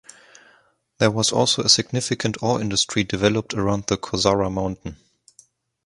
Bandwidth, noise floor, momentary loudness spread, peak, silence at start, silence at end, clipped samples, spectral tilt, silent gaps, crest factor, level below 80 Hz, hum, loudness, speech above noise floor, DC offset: 11.5 kHz; -59 dBFS; 8 LU; 0 dBFS; 1 s; 0.9 s; under 0.1%; -3.5 dB/octave; none; 22 dB; -48 dBFS; none; -20 LUFS; 38 dB; under 0.1%